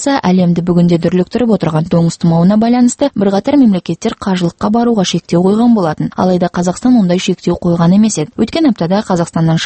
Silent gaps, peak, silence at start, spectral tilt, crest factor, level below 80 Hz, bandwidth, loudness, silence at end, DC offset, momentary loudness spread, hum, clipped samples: none; 0 dBFS; 0 s; -6.5 dB/octave; 10 dB; -42 dBFS; 8.8 kHz; -12 LUFS; 0 s; under 0.1%; 5 LU; none; under 0.1%